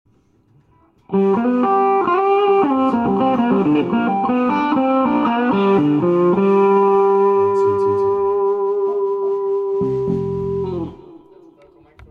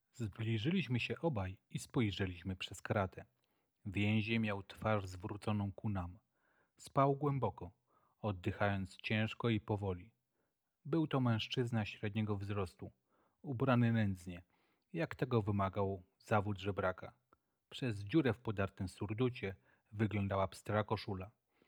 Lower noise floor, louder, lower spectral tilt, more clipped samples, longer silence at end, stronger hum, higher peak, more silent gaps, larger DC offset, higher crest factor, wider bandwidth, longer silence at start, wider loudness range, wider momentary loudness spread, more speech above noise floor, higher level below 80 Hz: second, -56 dBFS vs -86 dBFS; first, -17 LUFS vs -39 LUFS; first, -9 dB/octave vs -7 dB/octave; neither; first, 0.95 s vs 0.4 s; neither; first, -6 dBFS vs -16 dBFS; neither; neither; second, 12 dB vs 22 dB; second, 5 kHz vs 13 kHz; first, 1.1 s vs 0.15 s; first, 5 LU vs 2 LU; second, 6 LU vs 14 LU; second, 40 dB vs 48 dB; first, -52 dBFS vs -68 dBFS